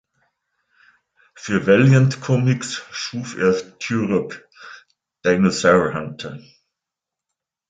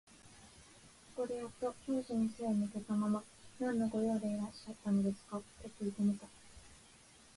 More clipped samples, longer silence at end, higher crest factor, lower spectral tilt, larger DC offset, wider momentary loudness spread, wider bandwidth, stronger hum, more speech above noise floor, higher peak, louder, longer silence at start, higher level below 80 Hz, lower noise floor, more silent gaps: neither; first, 1.3 s vs 0.55 s; about the same, 18 dB vs 14 dB; about the same, -6 dB/octave vs -7 dB/octave; neither; about the same, 21 LU vs 23 LU; second, 9.2 kHz vs 11.5 kHz; neither; first, 67 dB vs 25 dB; first, -2 dBFS vs -26 dBFS; first, -19 LUFS vs -38 LUFS; first, 1.4 s vs 0.25 s; first, -54 dBFS vs -68 dBFS; first, -85 dBFS vs -62 dBFS; neither